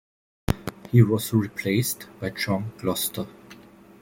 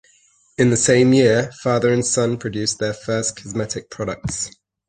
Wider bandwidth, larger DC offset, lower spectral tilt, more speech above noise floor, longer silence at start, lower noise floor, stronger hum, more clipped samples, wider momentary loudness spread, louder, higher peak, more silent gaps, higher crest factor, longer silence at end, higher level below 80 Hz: first, 17 kHz vs 10 kHz; neither; about the same, -5.5 dB/octave vs -4.5 dB/octave; second, 25 dB vs 38 dB; about the same, 0.5 s vs 0.6 s; second, -48 dBFS vs -57 dBFS; neither; neither; about the same, 13 LU vs 13 LU; second, -25 LUFS vs -19 LUFS; about the same, -4 dBFS vs -2 dBFS; neither; about the same, 22 dB vs 18 dB; about the same, 0.45 s vs 0.4 s; about the same, -46 dBFS vs -48 dBFS